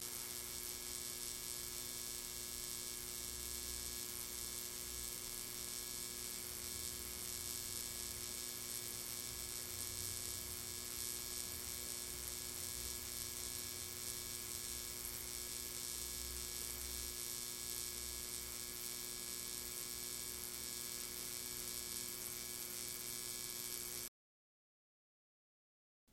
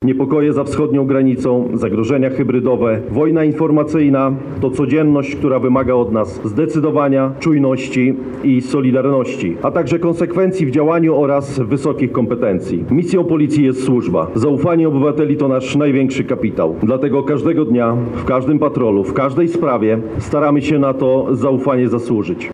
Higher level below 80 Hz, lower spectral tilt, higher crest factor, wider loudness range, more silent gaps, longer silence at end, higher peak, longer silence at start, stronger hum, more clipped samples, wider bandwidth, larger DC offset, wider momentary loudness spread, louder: second, -62 dBFS vs -44 dBFS; second, -0.5 dB/octave vs -8 dB/octave; first, 24 dB vs 10 dB; about the same, 1 LU vs 1 LU; neither; first, 2.05 s vs 0 s; second, -22 dBFS vs -4 dBFS; about the same, 0 s vs 0 s; neither; neither; first, 17 kHz vs 10.5 kHz; neither; second, 1 LU vs 4 LU; second, -43 LUFS vs -15 LUFS